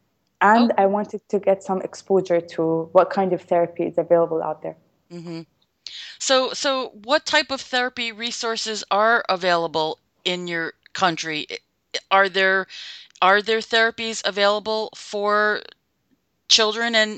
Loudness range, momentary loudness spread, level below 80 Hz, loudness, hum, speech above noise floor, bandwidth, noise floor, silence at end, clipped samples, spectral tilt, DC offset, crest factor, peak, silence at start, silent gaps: 4 LU; 15 LU; -68 dBFS; -21 LUFS; none; 47 dB; 9.2 kHz; -68 dBFS; 0 s; under 0.1%; -3 dB/octave; under 0.1%; 20 dB; -2 dBFS; 0.4 s; none